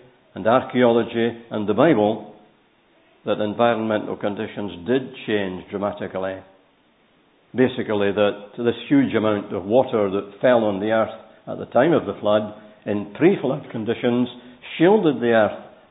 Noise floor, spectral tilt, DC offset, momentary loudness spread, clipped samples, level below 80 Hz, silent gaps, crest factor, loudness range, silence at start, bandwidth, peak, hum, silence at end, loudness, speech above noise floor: -59 dBFS; -11 dB/octave; under 0.1%; 12 LU; under 0.1%; -58 dBFS; none; 20 dB; 5 LU; 0.35 s; 4 kHz; -2 dBFS; none; 0.2 s; -21 LUFS; 39 dB